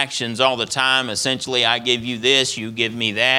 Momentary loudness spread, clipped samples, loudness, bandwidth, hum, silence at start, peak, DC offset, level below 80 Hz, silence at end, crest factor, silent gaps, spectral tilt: 6 LU; under 0.1%; -18 LUFS; 17.5 kHz; none; 0 s; 0 dBFS; under 0.1%; -60 dBFS; 0 s; 18 dB; none; -2 dB/octave